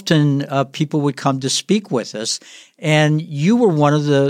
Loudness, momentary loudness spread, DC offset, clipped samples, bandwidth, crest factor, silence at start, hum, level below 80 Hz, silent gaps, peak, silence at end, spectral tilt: -17 LUFS; 8 LU; under 0.1%; under 0.1%; 13.5 kHz; 16 dB; 0.05 s; none; -66 dBFS; none; 0 dBFS; 0 s; -5.5 dB/octave